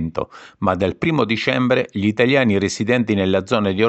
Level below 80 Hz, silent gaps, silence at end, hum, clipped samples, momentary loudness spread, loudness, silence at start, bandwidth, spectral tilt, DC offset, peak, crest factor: -50 dBFS; none; 0 s; none; under 0.1%; 7 LU; -18 LUFS; 0 s; 8.6 kHz; -6 dB/octave; under 0.1%; -2 dBFS; 16 dB